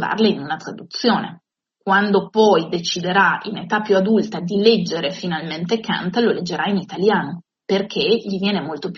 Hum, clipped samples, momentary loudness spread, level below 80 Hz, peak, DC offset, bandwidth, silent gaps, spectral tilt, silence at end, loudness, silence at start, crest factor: none; under 0.1%; 9 LU; -62 dBFS; -2 dBFS; under 0.1%; 7.4 kHz; none; -3.5 dB/octave; 0 s; -19 LUFS; 0 s; 18 dB